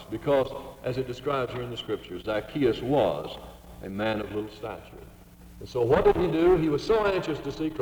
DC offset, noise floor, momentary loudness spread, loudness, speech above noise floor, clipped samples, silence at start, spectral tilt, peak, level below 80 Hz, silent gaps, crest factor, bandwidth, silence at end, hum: under 0.1%; -49 dBFS; 17 LU; -27 LUFS; 22 dB; under 0.1%; 0 s; -7 dB/octave; -10 dBFS; -46 dBFS; none; 18 dB; over 20 kHz; 0 s; none